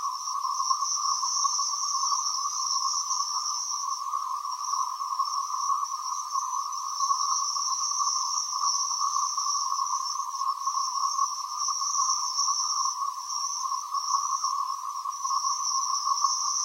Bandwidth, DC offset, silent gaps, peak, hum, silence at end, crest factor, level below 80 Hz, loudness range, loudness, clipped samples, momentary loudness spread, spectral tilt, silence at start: 16 kHz; under 0.1%; none; -12 dBFS; none; 0 s; 16 dB; under -90 dBFS; 3 LU; -27 LUFS; under 0.1%; 6 LU; 11.5 dB/octave; 0 s